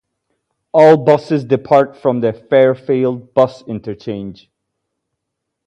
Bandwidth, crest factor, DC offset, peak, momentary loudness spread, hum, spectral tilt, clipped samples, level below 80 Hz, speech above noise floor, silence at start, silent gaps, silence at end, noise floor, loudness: 8.6 kHz; 16 dB; under 0.1%; 0 dBFS; 16 LU; none; -8 dB/octave; under 0.1%; -56 dBFS; 63 dB; 0.75 s; none; 1.35 s; -77 dBFS; -13 LUFS